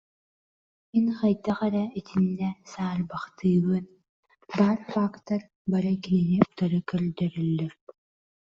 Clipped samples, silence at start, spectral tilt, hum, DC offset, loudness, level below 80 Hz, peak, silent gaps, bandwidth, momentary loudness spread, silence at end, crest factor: under 0.1%; 0.95 s; -8.5 dB/octave; none; under 0.1%; -27 LUFS; -62 dBFS; -4 dBFS; 4.09-4.23 s, 5.55-5.65 s; 7.2 kHz; 8 LU; 0.7 s; 22 dB